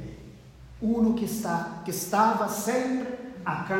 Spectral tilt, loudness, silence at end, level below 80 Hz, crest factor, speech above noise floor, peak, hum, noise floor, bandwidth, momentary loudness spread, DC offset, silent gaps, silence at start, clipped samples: -5 dB/octave; -27 LUFS; 0 s; -54 dBFS; 18 dB; 21 dB; -10 dBFS; none; -47 dBFS; 16.5 kHz; 11 LU; under 0.1%; none; 0 s; under 0.1%